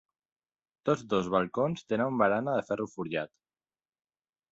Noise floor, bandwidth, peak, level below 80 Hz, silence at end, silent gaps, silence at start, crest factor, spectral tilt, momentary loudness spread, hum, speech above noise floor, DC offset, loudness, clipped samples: under -90 dBFS; 8 kHz; -12 dBFS; -68 dBFS; 1.25 s; none; 0.85 s; 20 dB; -6.5 dB/octave; 9 LU; none; over 61 dB; under 0.1%; -30 LUFS; under 0.1%